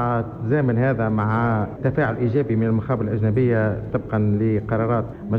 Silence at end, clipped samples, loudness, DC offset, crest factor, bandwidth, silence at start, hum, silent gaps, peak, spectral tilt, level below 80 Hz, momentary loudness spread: 0 s; under 0.1%; -21 LUFS; under 0.1%; 12 dB; 4.3 kHz; 0 s; none; none; -8 dBFS; -11 dB/octave; -44 dBFS; 4 LU